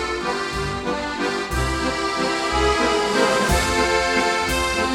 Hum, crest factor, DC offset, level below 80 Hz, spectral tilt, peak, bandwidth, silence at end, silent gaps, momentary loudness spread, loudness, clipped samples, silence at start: none; 14 dB; under 0.1%; -32 dBFS; -3.5 dB/octave; -6 dBFS; 16.5 kHz; 0 s; none; 6 LU; -20 LUFS; under 0.1%; 0 s